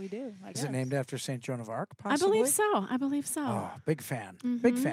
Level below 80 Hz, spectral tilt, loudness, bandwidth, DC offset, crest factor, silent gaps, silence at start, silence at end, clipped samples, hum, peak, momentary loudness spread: -80 dBFS; -4.5 dB/octave; -31 LUFS; 16.5 kHz; under 0.1%; 18 dB; none; 0 s; 0 s; under 0.1%; none; -14 dBFS; 12 LU